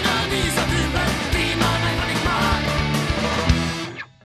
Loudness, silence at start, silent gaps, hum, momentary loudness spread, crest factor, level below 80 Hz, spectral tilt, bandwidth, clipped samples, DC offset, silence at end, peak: -21 LUFS; 0 s; none; none; 3 LU; 18 dB; -30 dBFS; -4.5 dB/octave; 14 kHz; under 0.1%; under 0.1%; 0.3 s; -2 dBFS